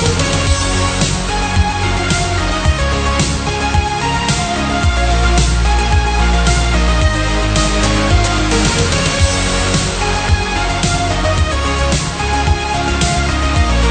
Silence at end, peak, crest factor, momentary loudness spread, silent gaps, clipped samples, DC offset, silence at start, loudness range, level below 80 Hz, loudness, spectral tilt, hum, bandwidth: 0 s; 0 dBFS; 14 dB; 3 LU; none; under 0.1%; under 0.1%; 0 s; 2 LU; -18 dBFS; -14 LUFS; -4 dB/octave; none; 9.4 kHz